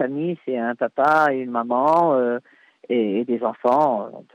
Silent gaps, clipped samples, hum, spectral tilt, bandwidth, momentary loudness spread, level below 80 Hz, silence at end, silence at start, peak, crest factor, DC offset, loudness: none; under 0.1%; none; -7.5 dB/octave; 11 kHz; 8 LU; -72 dBFS; 0.15 s; 0 s; -8 dBFS; 14 dB; under 0.1%; -21 LUFS